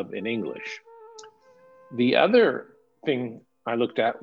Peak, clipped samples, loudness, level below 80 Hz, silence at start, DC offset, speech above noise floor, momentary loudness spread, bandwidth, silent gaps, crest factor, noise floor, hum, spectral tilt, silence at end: -6 dBFS; under 0.1%; -24 LUFS; -78 dBFS; 0 s; under 0.1%; 31 dB; 18 LU; 7.4 kHz; none; 20 dB; -55 dBFS; none; -6 dB/octave; 0.05 s